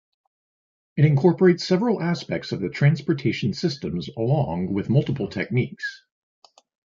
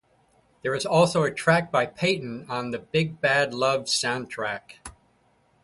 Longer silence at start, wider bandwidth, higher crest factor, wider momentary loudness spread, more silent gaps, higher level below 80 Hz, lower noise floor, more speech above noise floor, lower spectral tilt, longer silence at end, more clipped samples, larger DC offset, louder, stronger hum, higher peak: first, 0.95 s vs 0.65 s; second, 7.4 kHz vs 11.5 kHz; about the same, 18 dB vs 20 dB; about the same, 11 LU vs 12 LU; neither; first, -54 dBFS vs -60 dBFS; first, under -90 dBFS vs -64 dBFS; first, over 68 dB vs 40 dB; first, -7.5 dB/octave vs -4 dB/octave; first, 0.95 s vs 0.75 s; neither; neither; about the same, -23 LUFS vs -24 LUFS; neither; about the same, -4 dBFS vs -6 dBFS